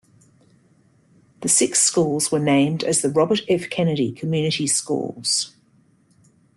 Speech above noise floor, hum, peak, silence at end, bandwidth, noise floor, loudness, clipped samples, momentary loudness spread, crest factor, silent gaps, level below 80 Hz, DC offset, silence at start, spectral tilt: 38 dB; none; -4 dBFS; 1.1 s; 12.5 kHz; -58 dBFS; -20 LUFS; under 0.1%; 7 LU; 20 dB; none; -62 dBFS; under 0.1%; 1.4 s; -3.5 dB/octave